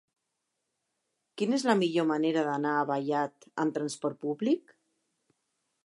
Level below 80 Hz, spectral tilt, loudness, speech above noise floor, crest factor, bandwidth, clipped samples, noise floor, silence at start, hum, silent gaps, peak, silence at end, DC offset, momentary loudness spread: -86 dBFS; -5.5 dB/octave; -30 LUFS; 54 dB; 22 dB; 11.5 kHz; under 0.1%; -83 dBFS; 1.35 s; none; none; -10 dBFS; 1.25 s; under 0.1%; 8 LU